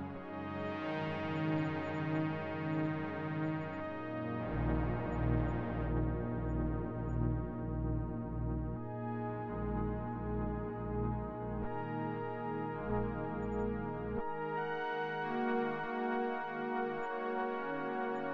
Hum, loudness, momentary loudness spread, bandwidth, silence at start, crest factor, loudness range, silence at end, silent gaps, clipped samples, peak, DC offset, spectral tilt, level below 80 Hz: none; -38 LUFS; 5 LU; 7 kHz; 0 s; 16 dB; 2 LU; 0 s; none; under 0.1%; -22 dBFS; under 0.1%; -9.5 dB/octave; -46 dBFS